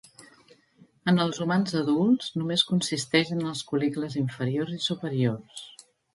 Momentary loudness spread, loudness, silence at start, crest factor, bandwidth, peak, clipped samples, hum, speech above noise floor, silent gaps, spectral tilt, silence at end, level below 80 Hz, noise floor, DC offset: 7 LU; -26 LUFS; 0.2 s; 20 dB; 11.5 kHz; -8 dBFS; under 0.1%; none; 33 dB; none; -5 dB/octave; 0.45 s; -68 dBFS; -60 dBFS; under 0.1%